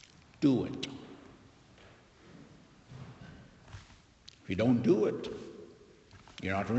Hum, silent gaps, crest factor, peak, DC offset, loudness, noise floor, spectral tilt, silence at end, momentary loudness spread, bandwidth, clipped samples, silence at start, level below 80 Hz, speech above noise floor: none; none; 20 dB; -14 dBFS; under 0.1%; -32 LUFS; -58 dBFS; -7 dB/octave; 0 s; 27 LU; 8.2 kHz; under 0.1%; 0.4 s; -64 dBFS; 29 dB